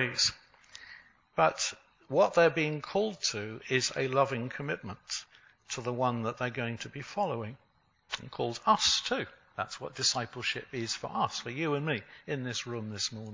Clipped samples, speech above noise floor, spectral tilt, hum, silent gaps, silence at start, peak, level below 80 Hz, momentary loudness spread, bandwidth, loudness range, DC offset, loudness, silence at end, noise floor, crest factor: under 0.1%; 23 dB; -3 dB/octave; none; none; 0 s; -10 dBFS; -66 dBFS; 13 LU; 7.8 kHz; 6 LU; under 0.1%; -31 LUFS; 0 s; -55 dBFS; 22 dB